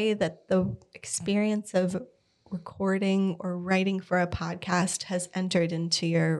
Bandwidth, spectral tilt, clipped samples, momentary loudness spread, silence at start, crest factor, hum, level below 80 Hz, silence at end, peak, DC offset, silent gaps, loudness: 12 kHz; -5 dB/octave; under 0.1%; 8 LU; 0 s; 16 dB; none; -56 dBFS; 0 s; -12 dBFS; under 0.1%; none; -28 LUFS